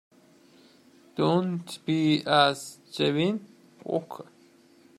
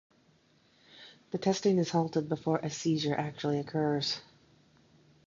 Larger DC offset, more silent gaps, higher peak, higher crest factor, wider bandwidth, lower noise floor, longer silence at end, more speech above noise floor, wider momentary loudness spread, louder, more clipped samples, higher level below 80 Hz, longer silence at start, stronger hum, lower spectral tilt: neither; neither; first, -6 dBFS vs -14 dBFS; about the same, 22 dB vs 20 dB; first, 14 kHz vs 7.6 kHz; second, -58 dBFS vs -66 dBFS; second, 0.75 s vs 1.05 s; second, 32 dB vs 36 dB; first, 18 LU vs 12 LU; first, -26 LUFS vs -31 LUFS; neither; about the same, -70 dBFS vs -70 dBFS; first, 1.15 s vs 0.95 s; neither; about the same, -5.5 dB/octave vs -5.5 dB/octave